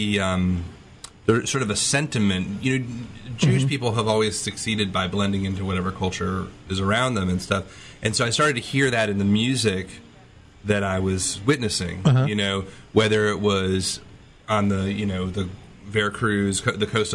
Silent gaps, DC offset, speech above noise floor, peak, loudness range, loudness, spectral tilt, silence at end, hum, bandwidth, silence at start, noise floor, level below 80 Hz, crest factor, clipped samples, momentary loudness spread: none; under 0.1%; 26 dB; -4 dBFS; 2 LU; -23 LUFS; -4.5 dB/octave; 0 s; none; 12 kHz; 0 s; -48 dBFS; -50 dBFS; 20 dB; under 0.1%; 9 LU